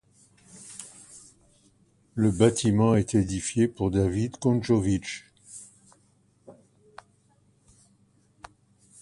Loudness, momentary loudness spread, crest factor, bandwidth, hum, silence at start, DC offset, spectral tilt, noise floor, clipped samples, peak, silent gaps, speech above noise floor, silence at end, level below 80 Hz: -25 LUFS; 23 LU; 22 dB; 11.5 kHz; none; 0.6 s; under 0.1%; -6 dB/octave; -64 dBFS; under 0.1%; -6 dBFS; none; 40 dB; 2.5 s; -50 dBFS